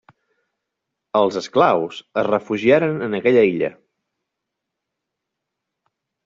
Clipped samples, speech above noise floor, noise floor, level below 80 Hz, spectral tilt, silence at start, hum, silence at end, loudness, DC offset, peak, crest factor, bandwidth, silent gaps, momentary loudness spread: under 0.1%; 63 dB; -81 dBFS; -64 dBFS; -4.5 dB/octave; 1.15 s; none; 2.55 s; -18 LUFS; under 0.1%; -2 dBFS; 20 dB; 7.6 kHz; none; 8 LU